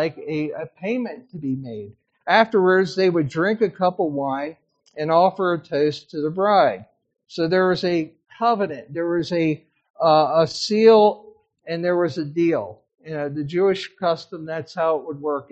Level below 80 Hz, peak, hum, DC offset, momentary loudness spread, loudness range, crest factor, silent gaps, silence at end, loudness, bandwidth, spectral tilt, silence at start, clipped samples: -66 dBFS; -2 dBFS; none; under 0.1%; 14 LU; 5 LU; 20 dB; 9.90-9.94 s; 0.1 s; -21 LUFS; 8.2 kHz; -6 dB/octave; 0 s; under 0.1%